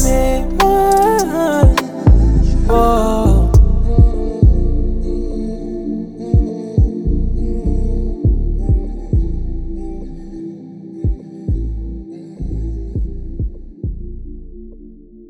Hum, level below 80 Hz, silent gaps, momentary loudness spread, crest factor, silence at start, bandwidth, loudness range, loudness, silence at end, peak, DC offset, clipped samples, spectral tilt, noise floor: none; -16 dBFS; none; 17 LU; 14 dB; 0 s; 16 kHz; 13 LU; -17 LUFS; 0.05 s; 0 dBFS; under 0.1%; under 0.1%; -7 dB/octave; -37 dBFS